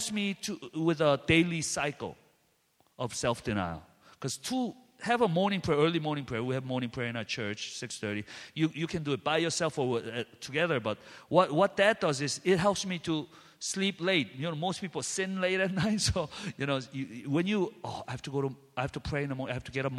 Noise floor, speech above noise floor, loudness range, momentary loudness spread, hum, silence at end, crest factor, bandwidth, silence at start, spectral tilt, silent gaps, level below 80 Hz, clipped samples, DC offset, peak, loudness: -71 dBFS; 40 dB; 5 LU; 12 LU; none; 0 s; 22 dB; 14.5 kHz; 0 s; -4.5 dB/octave; none; -56 dBFS; under 0.1%; under 0.1%; -8 dBFS; -31 LUFS